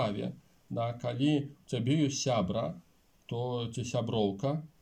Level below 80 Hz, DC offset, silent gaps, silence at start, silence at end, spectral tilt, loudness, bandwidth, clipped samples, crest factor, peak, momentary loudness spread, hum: -66 dBFS; under 0.1%; none; 0 s; 0.15 s; -6 dB/octave; -33 LUFS; 10.5 kHz; under 0.1%; 14 dB; -18 dBFS; 10 LU; none